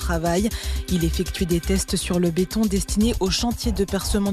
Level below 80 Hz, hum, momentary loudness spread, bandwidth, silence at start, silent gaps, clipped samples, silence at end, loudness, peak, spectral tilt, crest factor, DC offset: -30 dBFS; none; 3 LU; 14 kHz; 0 s; none; under 0.1%; 0 s; -23 LUFS; -10 dBFS; -5 dB/octave; 12 dB; under 0.1%